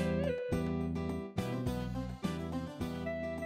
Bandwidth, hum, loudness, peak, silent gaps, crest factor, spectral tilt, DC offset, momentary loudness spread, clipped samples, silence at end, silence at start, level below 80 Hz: 16 kHz; none; -37 LUFS; -20 dBFS; none; 16 dB; -7 dB/octave; under 0.1%; 5 LU; under 0.1%; 0 s; 0 s; -50 dBFS